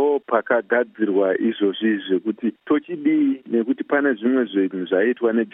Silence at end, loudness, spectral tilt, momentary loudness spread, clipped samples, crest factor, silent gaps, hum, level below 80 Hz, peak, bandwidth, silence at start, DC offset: 0.05 s; -21 LUFS; -9.5 dB/octave; 4 LU; under 0.1%; 16 dB; none; none; -80 dBFS; -4 dBFS; 3.8 kHz; 0 s; under 0.1%